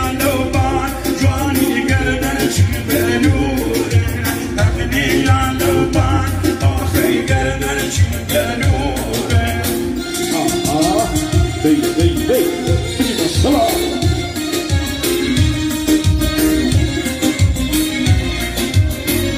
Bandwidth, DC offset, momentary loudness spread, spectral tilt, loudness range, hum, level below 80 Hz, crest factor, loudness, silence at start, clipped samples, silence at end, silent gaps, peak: 16 kHz; under 0.1%; 4 LU; -5 dB/octave; 1 LU; none; -26 dBFS; 14 dB; -16 LUFS; 0 s; under 0.1%; 0 s; none; -2 dBFS